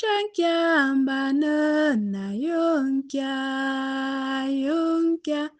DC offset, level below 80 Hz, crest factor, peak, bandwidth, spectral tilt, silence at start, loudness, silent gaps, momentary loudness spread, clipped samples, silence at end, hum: under 0.1%; -72 dBFS; 14 dB; -10 dBFS; 9 kHz; -5 dB/octave; 0 s; -24 LUFS; none; 6 LU; under 0.1%; 0.1 s; none